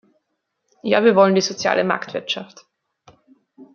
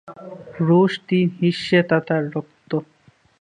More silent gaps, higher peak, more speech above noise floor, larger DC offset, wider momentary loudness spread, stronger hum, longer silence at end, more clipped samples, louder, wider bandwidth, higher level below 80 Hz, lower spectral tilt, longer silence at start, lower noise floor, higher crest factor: neither; about the same, -2 dBFS vs -2 dBFS; first, 57 dB vs 37 dB; neither; second, 13 LU vs 16 LU; neither; second, 0.1 s vs 0.6 s; neither; about the same, -18 LUFS vs -20 LUFS; second, 7.2 kHz vs 9.6 kHz; about the same, -68 dBFS vs -64 dBFS; second, -4.5 dB/octave vs -7.5 dB/octave; first, 0.85 s vs 0.05 s; first, -75 dBFS vs -56 dBFS; about the same, 20 dB vs 18 dB